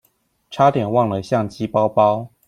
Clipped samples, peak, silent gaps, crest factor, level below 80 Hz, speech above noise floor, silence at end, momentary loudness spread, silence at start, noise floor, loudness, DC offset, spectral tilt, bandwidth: under 0.1%; -2 dBFS; none; 18 dB; -56 dBFS; 45 dB; 0.2 s; 6 LU; 0.5 s; -63 dBFS; -18 LUFS; under 0.1%; -7.5 dB/octave; 13 kHz